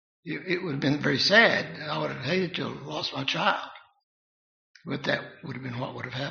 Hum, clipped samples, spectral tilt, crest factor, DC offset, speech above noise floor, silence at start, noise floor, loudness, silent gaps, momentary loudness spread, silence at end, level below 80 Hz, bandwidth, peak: none; under 0.1%; -2.5 dB/octave; 22 dB; under 0.1%; over 63 dB; 0.25 s; under -90 dBFS; -26 LUFS; 4.03-4.74 s; 17 LU; 0 s; -66 dBFS; 7 kHz; -6 dBFS